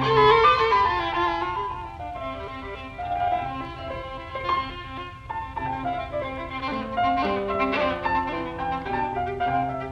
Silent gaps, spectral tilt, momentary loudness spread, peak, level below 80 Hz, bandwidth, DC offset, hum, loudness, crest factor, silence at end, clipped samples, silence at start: none; -6 dB/octave; 15 LU; -4 dBFS; -44 dBFS; 9 kHz; under 0.1%; none; -25 LUFS; 20 dB; 0 s; under 0.1%; 0 s